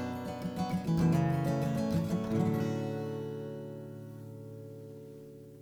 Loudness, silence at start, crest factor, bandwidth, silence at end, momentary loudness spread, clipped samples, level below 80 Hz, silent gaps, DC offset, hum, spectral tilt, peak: -33 LUFS; 0 s; 16 dB; 17.5 kHz; 0 s; 18 LU; under 0.1%; -58 dBFS; none; under 0.1%; none; -8 dB/octave; -18 dBFS